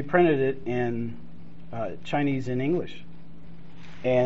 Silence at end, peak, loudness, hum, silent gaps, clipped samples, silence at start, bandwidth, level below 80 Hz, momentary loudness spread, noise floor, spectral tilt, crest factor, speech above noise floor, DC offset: 0 s; -6 dBFS; -27 LUFS; none; none; under 0.1%; 0 s; 7.6 kHz; -56 dBFS; 26 LU; -47 dBFS; -6 dB/octave; 20 dB; 21 dB; 2%